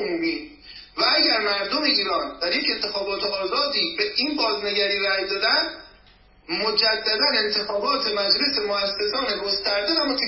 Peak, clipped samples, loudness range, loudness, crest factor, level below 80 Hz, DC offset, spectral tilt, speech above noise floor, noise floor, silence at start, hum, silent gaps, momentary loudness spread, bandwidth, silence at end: -4 dBFS; under 0.1%; 1 LU; -21 LUFS; 18 dB; -56 dBFS; under 0.1%; -5 dB/octave; 30 dB; -54 dBFS; 0 s; none; none; 6 LU; 5.8 kHz; 0 s